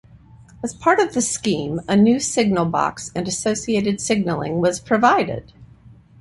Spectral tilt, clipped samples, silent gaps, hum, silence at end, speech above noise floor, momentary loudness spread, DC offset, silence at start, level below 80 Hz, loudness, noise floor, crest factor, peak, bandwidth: -4.5 dB/octave; under 0.1%; none; none; 0.55 s; 28 dB; 9 LU; under 0.1%; 0.6 s; -50 dBFS; -19 LUFS; -47 dBFS; 18 dB; -2 dBFS; 11.5 kHz